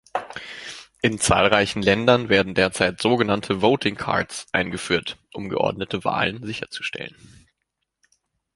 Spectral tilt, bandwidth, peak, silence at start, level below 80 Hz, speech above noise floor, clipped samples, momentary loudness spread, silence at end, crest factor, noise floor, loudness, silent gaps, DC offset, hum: -4 dB/octave; 11.5 kHz; 0 dBFS; 0.15 s; -48 dBFS; 57 dB; under 0.1%; 16 LU; 1.45 s; 22 dB; -79 dBFS; -21 LUFS; none; under 0.1%; none